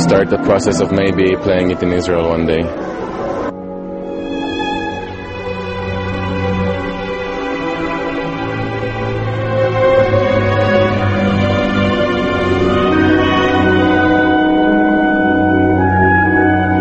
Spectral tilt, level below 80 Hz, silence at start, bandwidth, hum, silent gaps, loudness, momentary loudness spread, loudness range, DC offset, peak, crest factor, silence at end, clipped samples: -6.5 dB/octave; -34 dBFS; 0 s; 8.4 kHz; none; none; -14 LUFS; 10 LU; 8 LU; under 0.1%; 0 dBFS; 14 dB; 0 s; under 0.1%